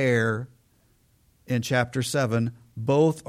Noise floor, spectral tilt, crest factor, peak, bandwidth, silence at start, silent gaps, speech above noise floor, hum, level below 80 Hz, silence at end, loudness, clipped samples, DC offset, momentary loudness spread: -63 dBFS; -6 dB/octave; 16 dB; -10 dBFS; 15.5 kHz; 0 s; none; 39 dB; none; -60 dBFS; 0.05 s; -25 LUFS; under 0.1%; under 0.1%; 11 LU